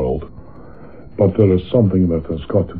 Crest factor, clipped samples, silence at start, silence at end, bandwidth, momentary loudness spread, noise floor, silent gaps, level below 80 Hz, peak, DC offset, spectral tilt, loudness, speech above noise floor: 18 dB; under 0.1%; 0 s; 0 s; 4.5 kHz; 14 LU; -39 dBFS; none; -36 dBFS; 0 dBFS; 1%; -12.5 dB/octave; -17 LUFS; 24 dB